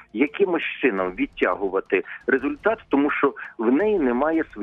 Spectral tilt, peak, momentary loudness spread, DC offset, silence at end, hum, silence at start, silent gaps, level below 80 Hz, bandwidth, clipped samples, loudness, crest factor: -8 dB/octave; -6 dBFS; 5 LU; under 0.1%; 0 s; none; 0.15 s; none; -54 dBFS; 3.9 kHz; under 0.1%; -23 LUFS; 16 dB